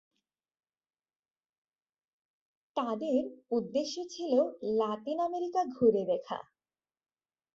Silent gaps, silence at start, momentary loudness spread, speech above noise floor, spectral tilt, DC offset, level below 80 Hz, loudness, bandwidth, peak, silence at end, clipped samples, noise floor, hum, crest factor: none; 2.75 s; 10 LU; over 59 dB; -5.5 dB/octave; under 0.1%; -76 dBFS; -32 LUFS; 7.6 kHz; -14 dBFS; 1.15 s; under 0.1%; under -90 dBFS; none; 20 dB